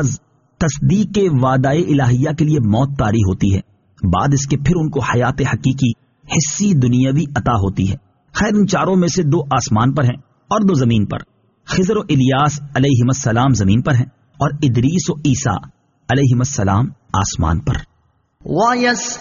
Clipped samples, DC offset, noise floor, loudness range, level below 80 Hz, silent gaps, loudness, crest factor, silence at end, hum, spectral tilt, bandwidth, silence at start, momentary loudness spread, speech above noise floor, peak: under 0.1%; under 0.1%; -60 dBFS; 2 LU; -36 dBFS; none; -16 LUFS; 14 dB; 0 s; none; -6.5 dB/octave; 7.4 kHz; 0 s; 7 LU; 45 dB; -2 dBFS